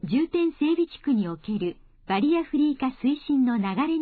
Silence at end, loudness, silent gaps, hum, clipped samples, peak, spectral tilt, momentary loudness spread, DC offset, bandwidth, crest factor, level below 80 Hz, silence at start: 0 s; -25 LUFS; none; none; under 0.1%; -14 dBFS; -10 dB/octave; 6 LU; under 0.1%; 4.7 kHz; 12 dB; -56 dBFS; 0 s